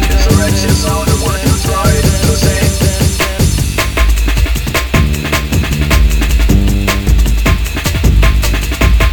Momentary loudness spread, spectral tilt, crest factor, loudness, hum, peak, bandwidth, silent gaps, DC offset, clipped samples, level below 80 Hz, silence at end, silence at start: 3 LU; -4.5 dB/octave; 10 dB; -12 LUFS; none; 0 dBFS; 19.5 kHz; none; 0.7%; 0.1%; -12 dBFS; 0 s; 0 s